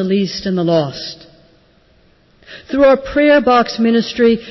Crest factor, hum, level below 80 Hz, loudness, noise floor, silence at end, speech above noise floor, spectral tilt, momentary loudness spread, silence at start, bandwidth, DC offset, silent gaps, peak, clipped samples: 12 dB; none; -44 dBFS; -14 LUFS; -52 dBFS; 0 s; 38 dB; -6 dB/octave; 11 LU; 0 s; 6.2 kHz; under 0.1%; none; -4 dBFS; under 0.1%